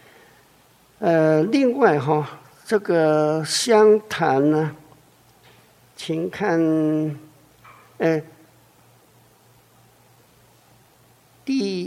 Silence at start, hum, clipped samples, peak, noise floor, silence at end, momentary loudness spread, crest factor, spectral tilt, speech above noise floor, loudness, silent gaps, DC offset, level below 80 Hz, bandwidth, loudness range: 1 s; none; under 0.1%; -2 dBFS; -55 dBFS; 0 s; 12 LU; 20 dB; -5.5 dB/octave; 37 dB; -20 LUFS; none; under 0.1%; -68 dBFS; 14.5 kHz; 13 LU